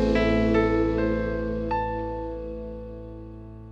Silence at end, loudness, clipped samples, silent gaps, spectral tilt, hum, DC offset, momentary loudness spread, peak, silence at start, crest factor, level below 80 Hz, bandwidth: 0 s; -25 LUFS; under 0.1%; none; -8 dB/octave; none; under 0.1%; 19 LU; -10 dBFS; 0 s; 16 dB; -36 dBFS; 7.8 kHz